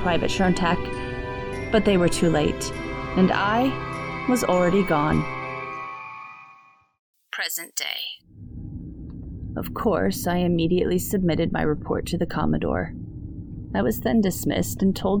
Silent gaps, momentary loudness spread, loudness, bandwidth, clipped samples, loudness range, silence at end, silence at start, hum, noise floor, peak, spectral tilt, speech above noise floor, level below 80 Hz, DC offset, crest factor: 6.99-7.14 s; 17 LU; -24 LUFS; 19.5 kHz; under 0.1%; 9 LU; 0 s; 0 s; none; -53 dBFS; -6 dBFS; -5.5 dB/octave; 31 dB; -40 dBFS; under 0.1%; 18 dB